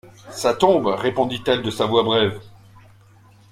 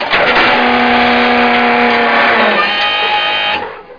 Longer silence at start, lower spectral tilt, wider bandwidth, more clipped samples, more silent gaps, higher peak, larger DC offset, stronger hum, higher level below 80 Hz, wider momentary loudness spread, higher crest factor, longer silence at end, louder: about the same, 0.05 s vs 0 s; about the same, -5 dB/octave vs -4.5 dB/octave; first, 16 kHz vs 5.2 kHz; neither; neither; about the same, -2 dBFS vs 0 dBFS; neither; neither; second, -56 dBFS vs -42 dBFS; first, 7 LU vs 3 LU; first, 20 dB vs 12 dB; first, 1.05 s vs 0 s; second, -20 LUFS vs -10 LUFS